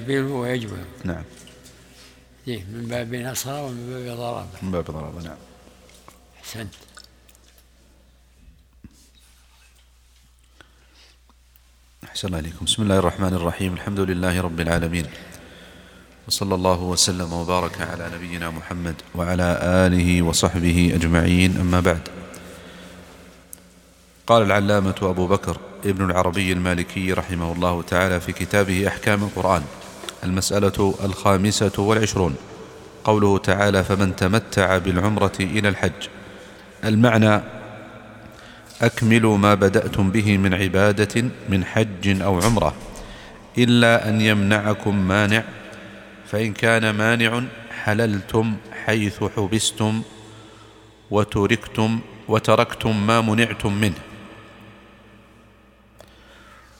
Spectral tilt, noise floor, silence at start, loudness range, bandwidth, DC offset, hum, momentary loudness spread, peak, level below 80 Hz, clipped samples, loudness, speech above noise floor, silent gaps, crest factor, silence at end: -5 dB/octave; -54 dBFS; 0 s; 11 LU; 17.5 kHz; under 0.1%; none; 20 LU; 0 dBFS; -42 dBFS; under 0.1%; -20 LUFS; 34 dB; none; 20 dB; 2.1 s